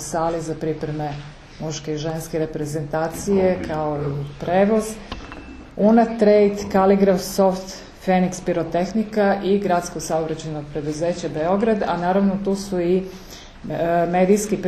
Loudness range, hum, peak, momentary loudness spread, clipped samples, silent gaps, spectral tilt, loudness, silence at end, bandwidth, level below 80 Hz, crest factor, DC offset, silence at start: 6 LU; none; -4 dBFS; 14 LU; under 0.1%; none; -6 dB/octave; -21 LUFS; 0 s; 13.5 kHz; -44 dBFS; 16 dB; under 0.1%; 0 s